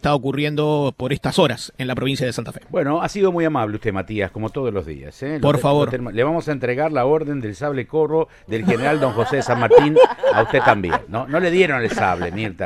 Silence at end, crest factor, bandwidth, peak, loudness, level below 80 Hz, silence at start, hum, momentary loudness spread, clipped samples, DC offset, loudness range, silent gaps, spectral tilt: 0 s; 18 dB; 14 kHz; 0 dBFS; -19 LUFS; -46 dBFS; 0.05 s; none; 10 LU; under 0.1%; under 0.1%; 6 LU; none; -6.5 dB/octave